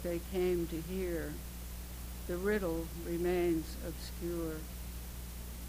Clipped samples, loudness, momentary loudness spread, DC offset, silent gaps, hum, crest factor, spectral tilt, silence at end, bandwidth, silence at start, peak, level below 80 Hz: under 0.1%; -38 LUFS; 12 LU; under 0.1%; none; 60 Hz at -45 dBFS; 16 dB; -6 dB/octave; 0 s; 16.5 kHz; 0 s; -22 dBFS; -44 dBFS